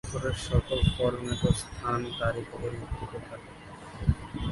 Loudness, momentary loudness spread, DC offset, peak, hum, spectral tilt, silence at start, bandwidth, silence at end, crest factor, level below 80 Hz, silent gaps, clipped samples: -30 LUFS; 17 LU; under 0.1%; -10 dBFS; none; -6 dB/octave; 0.05 s; 11.5 kHz; 0 s; 20 dB; -38 dBFS; none; under 0.1%